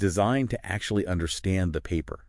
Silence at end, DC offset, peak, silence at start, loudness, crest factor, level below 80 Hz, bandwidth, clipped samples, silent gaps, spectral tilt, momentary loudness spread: 0.05 s; under 0.1%; -10 dBFS; 0 s; -28 LUFS; 16 dB; -44 dBFS; 12 kHz; under 0.1%; none; -5.5 dB/octave; 6 LU